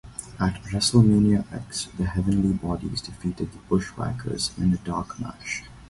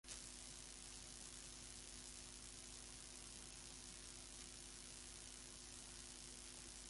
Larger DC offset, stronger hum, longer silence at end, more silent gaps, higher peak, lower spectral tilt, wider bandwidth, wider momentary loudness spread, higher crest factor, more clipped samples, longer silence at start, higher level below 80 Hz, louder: neither; neither; about the same, 0.05 s vs 0 s; neither; first, -4 dBFS vs -34 dBFS; first, -5.5 dB/octave vs -1.5 dB/octave; about the same, 11.5 kHz vs 11.5 kHz; first, 14 LU vs 1 LU; about the same, 20 dB vs 22 dB; neither; about the same, 0.05 s vs 0.05 s; first, -42 dBFS vs -66 dBFS; first, -25 LUFS vs -54 LUFS